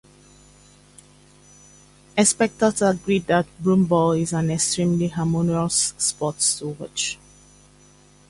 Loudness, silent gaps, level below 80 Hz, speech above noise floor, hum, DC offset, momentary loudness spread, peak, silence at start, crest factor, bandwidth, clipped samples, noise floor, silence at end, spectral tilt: -21 LUFS; none; -54 dBFS; 31 dB; 50 Hz at -40 dBFS; under 0.1%; 8 LU; -2 dBFS; 2.15 s; 20 dB; 11.5 kHz; under 0.1%; -52 dBFS; 1.15 s; -4.5 dB/octave